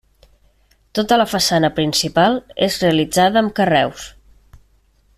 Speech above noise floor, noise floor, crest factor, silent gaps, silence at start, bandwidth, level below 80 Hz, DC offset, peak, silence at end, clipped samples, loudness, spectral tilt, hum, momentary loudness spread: 40 dB; -56 dBFS; 16 dB; none; 0.95 s; 15 kHz; -48 dBFS; under 0.1%; -2 dBFS; 1.05 s; under 0.1%; -16 LUFS; -4 dB/octave; none; 8 LU